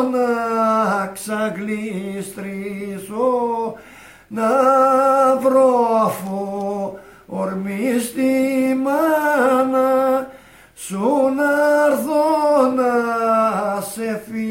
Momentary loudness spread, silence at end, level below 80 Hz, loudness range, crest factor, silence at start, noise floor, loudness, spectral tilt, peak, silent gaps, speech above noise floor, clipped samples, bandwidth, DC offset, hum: 13 LU; 0 s; -60 dBFS; 5 LU; 14 dB; 0 s; -44 dBFS; -18 LUFS; -5.5 dB/octave; -4 dBFS; none; 26 dB; under 0.1%; 16 kHz; under 0.1%; none